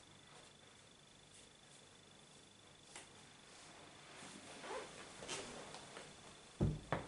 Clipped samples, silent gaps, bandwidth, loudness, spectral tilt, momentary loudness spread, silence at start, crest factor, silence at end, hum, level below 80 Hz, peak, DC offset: under 0.1%; none; 11.5 kHz; -50 LUFS; -4.5 dB/octave; 18 LU; 0 s; 28 dB; 0 s; none; -62 dBFS; -22 dBFS; under 0.1%